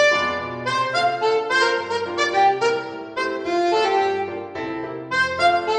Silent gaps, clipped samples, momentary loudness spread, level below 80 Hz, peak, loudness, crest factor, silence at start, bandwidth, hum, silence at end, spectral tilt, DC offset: none; under 0.1%; 11 LU; -58 dBFS; -6 dBFS; -21 LUFS; 16 dB; 0 s; 9.6 kHz; none; 0 s; -3.5 dB/octave; under 0.1%